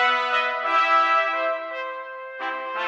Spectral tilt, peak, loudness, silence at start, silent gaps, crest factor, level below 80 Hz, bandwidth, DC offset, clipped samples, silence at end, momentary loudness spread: 0.5 dB/octave; -10 dBFS; -22 LUFS; 0 s; none; 14 dB; under -90 dBFS; 8.2 kHz; under 0.1%; under 0.1%; 0 s; 14 LU